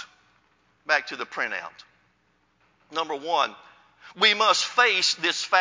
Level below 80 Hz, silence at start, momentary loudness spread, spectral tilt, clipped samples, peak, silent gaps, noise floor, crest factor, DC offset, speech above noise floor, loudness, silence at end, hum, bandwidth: -80 dBFS; 0 s; 14 LU; 0 dB/octave; under 0.1%; -4 dBFS; none; -67 dBFS; 22 dB; under 0.1%; 43 dB; -23 LUFS; 0 s; none; 7.8 kHz